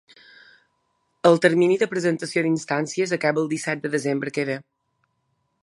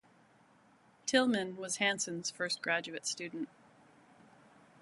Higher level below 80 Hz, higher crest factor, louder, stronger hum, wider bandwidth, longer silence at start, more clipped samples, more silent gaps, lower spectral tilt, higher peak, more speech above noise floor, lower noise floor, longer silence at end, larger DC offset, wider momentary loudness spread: first, -72 dBFS vs -84 dBFS; about the same, 22 dB vs 24 dB; first, -22 LUFS vs -34 LUFS; neither; about the same, 11.5 kHz vs 11.5 kHz; first, 1.25 s vs 1.05 s; neither; neither; first, -5.5 dB/octave vs -2.5 dB/octave; first, -2 dBFS vs -14 dBFS; first, 51 dB vs 31 dB; first, -72 dBFS vs -65 dBFS; second, 1.05 s vs 1.35 s; neither; second, 9 LU vs 12 LU